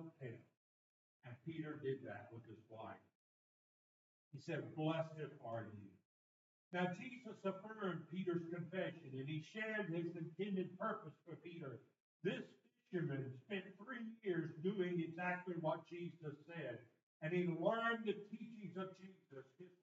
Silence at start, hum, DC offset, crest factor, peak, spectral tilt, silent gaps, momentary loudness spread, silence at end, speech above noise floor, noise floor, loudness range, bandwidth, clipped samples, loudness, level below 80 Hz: 0 s; none; under 0.1%; 22 dB; -26 dBFS; -5.5 dB/octave; 0.57-1.20 s, 3.15-4.31 s, 6.05-6.71 s, 12.00-12.20 s, 17.03-17.20 s; 16 LU; 0.1 s; over 44 dB; under -90 dBFS; 8 LU; 7.6 kHz; under 0.1%; -46 LUFS; under -90 dBFS